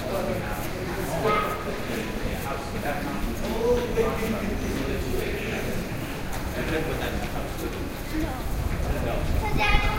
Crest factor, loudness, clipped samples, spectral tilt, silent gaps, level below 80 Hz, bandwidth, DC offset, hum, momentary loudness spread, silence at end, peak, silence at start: 22 dB; -28 LUFS; under 0.1%; -5.5 dB/octave; none; -32 dBFS; 16 kHz; under 0.1%; none; 7 LU; 0 s; -6 dBFS; 0 s